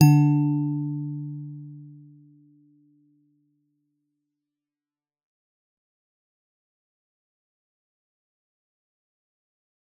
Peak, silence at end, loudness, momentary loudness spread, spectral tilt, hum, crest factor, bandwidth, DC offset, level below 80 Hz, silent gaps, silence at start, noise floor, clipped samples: -4 dBFS; 8.1 s; -24 LUFS; 25 LU; -9 dB/octave; none; 24 dB; 6.8 kHz; under 0.1%; -76 dBFS; none; 0 s; under -90 dBFS; under 0.1%